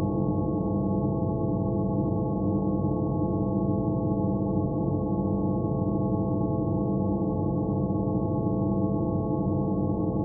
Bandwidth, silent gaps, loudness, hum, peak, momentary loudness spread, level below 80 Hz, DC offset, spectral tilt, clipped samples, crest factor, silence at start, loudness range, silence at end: 1.2 kHz; none; -27 LUFS; none; -14 dBFS; 1 LU; -42 dBFS; under 0.1%; -6.5 dB/octave; under 0.1%; 12 dB; 0 s; 0 LU; 0 s